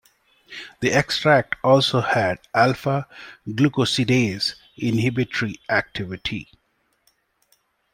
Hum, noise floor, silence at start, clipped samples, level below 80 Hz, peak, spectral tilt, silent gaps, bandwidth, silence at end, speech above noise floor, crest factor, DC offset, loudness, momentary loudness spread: none; -68 dBFS; 0.5 s; under 0.1%; -54 dBFS; -2 dBFS; -5 dB/octave; none; 16 kHz; 1.5 s; 47 dB; 20 dB; under 0.1%; -21 LUFS; 14 LU